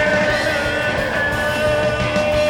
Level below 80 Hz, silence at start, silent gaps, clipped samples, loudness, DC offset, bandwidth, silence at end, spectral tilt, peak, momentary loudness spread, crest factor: -36 dBFS; 0 s; none; under 0.1%; -18 LUFS; under 0.1%; 18 kHz; 0 s; -4.5 dB/octave; -6 dBFS; 2 LU; 12 dB